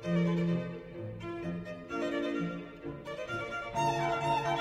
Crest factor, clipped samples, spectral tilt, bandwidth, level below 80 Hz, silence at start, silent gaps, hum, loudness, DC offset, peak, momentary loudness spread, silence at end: 16 dB; under 0.1%; -6.5 dB/octave; 10.5 kHz; -60 dBFS; 0 s; none; none; -35 LUFS; under 0.1%; -18 dBFS; 12 LU; 0 s